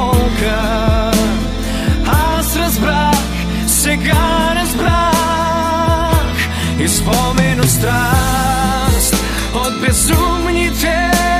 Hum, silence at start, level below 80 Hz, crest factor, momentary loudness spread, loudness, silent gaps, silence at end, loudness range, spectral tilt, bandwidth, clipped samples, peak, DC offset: none; 0 s; -20 dBFS; 12 dB; 4 LU; -14 LUFS; none; 0 s; 1 LU; -4 dB/octave; 15.5 kHz; under 0.1%; 0 dBFS; under 0.1%